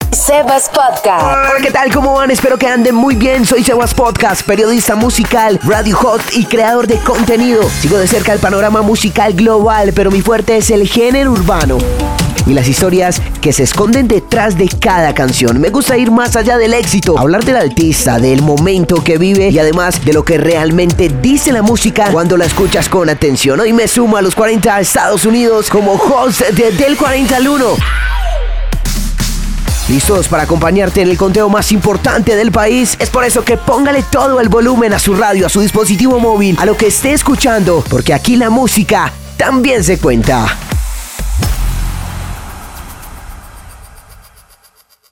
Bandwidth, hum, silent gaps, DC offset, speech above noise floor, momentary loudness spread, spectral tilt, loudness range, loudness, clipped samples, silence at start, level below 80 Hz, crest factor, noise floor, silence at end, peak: 19 kHz; none; none; 0.8%; 39 dB; 6 LU; -4.5 dB/octave; 4 LU; -10 LUFS; under 0.1%; 0 s; -22 dBFS; 8 dB; -48 dBFS; 1.1 s; 0 dBFS